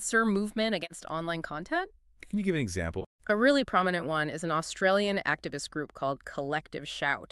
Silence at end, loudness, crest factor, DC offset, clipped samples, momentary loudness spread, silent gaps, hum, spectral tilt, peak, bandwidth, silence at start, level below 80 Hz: 0.05 s; -30 LUFS; 20 dB; under 0.1%; under 0.1%; 10 LU; 3.06-3.19 s; none; -4.5 dB/octave; -10 dBFS; 13 kHz; 0 s; -56 dBFS